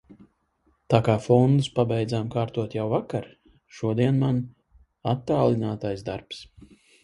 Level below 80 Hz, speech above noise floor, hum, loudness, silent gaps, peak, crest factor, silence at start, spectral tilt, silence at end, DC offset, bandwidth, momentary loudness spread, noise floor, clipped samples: -56 dBFS; 44 dB; none; -25 LUFS; none; -2 dBFS; 24 dB; 0.1 s; -8 dB/octave; 0.6 s; under 0.1%; 11 kHz; 13 LU; -68 dBFS; under 0.1%